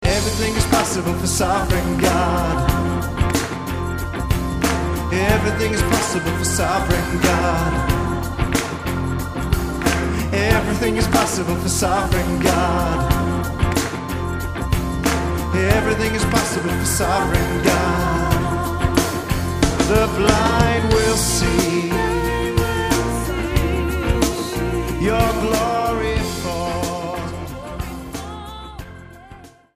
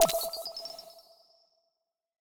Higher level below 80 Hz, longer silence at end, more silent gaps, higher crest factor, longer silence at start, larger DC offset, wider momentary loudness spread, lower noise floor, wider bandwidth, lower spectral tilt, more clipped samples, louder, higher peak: first, -28 dBFS vs -66 dBFS; second, 0.3 s vs 1.2 s; neither; second, 18 dB vs 28 dB; about the same, 0 s vs 0 s; neither; second, 8 LU vs 23 LU; second, -42 dBFS vs -83 dBFS; second, 15.5 kHz vs over 20 kHz; first, -5 dB/octave vs -1 dB/octave; neither; first, -19 LUFS vs -33 LUFS; first, 0 dBFS vs -6 dBFS